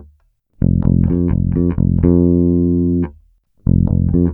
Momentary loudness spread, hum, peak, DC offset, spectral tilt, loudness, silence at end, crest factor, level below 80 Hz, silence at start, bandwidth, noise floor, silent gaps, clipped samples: 6 LU; none; 0 dBFS; under 0.1%; -15 dB/octave; -15 LUFS; 0 s; 14 dB; -26 dBFS; 0 s; 2.5 kHz; -55 dBFS; none; under 0.1%